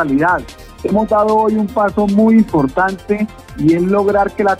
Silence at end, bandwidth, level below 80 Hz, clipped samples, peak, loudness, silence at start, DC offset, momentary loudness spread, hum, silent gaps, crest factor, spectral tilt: 0 s; 13.5 kHz; -40 dBFS; under 0.1%; -2 dBFS; -14 LUFS; 0 s; under 0.1%; 8 LU; none; none; 12 dB; -8 dB/octave